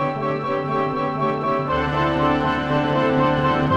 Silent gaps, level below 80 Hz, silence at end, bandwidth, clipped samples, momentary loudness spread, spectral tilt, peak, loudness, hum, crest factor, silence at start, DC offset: none; -42 dBFS; 0 s; 8.2 kHz; under 0.1%; 4 LU; -7.5 dB/octave; -6 dBFS; -21 LUFS; none; 14 dB; 0 s; under 0.1%